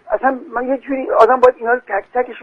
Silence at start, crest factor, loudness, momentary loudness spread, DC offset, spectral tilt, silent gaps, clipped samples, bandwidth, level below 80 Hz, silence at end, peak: 0.05 s; 16 dB; -16 LUFS; 10 LU; under 0.1%; -5 dB/octave; none; under 0.1%; 7.8 kHz; -50 dBFS; 0 s; 0 dBFS